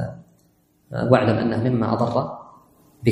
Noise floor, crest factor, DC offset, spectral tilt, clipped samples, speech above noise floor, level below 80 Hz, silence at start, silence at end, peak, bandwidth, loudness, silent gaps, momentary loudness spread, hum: -61 dBFS; 22 dB; under 0.1%; -8.5 dB/octave; under 0.1%; 41 dB; -52 dBFS; 0 s; 0 s; 0 dBFS; 10 kHz; -21 LUFS; none; 15 LU; none